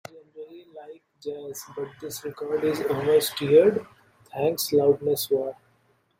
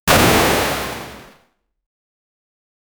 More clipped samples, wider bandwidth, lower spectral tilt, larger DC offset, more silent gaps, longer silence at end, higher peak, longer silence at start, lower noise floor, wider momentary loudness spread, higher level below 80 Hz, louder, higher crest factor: neither; second, 16 kHz vs over 20 kHz; about the same, -4.5 dB/octave vs -3.5 dB/octave; neither; neither; second, 0.65 s vs 1.75 s; second, -6 dBFS vs 0 dBFS; about the same, 0.15 s vs 0.05 s; first, -65 dBFS vs -60 dBFS; first, 24 LU vs 19 LU; second, -68 dBFS vs -36 dBFS; second, -24 LUFS vs -15 LUFS; about the same, 20 dB vs 20 dB